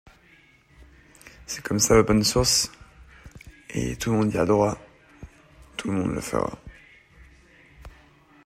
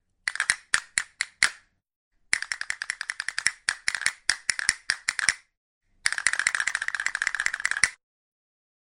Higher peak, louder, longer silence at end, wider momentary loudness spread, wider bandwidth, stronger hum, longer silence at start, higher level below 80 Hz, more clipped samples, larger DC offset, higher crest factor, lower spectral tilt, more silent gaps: second, -4 dBFS vs 0 dBFS; first, -23 LUFS vs -26 LUFS; second, 0.6 s vs 0.95 s; first, 19 LU vs 7 LU; about the same, 16 kHz vs 16 kHz; neither; first, 0.8 s vs 0.25 s; first, -44 dBFS vs -62 dBFS; neither; neither; second, 22 dB vs 28 dB; first, -4 dB/octave vs 2.5 dB/octave; second, none vs 1.96-2.11 s, 5.57-5.81 s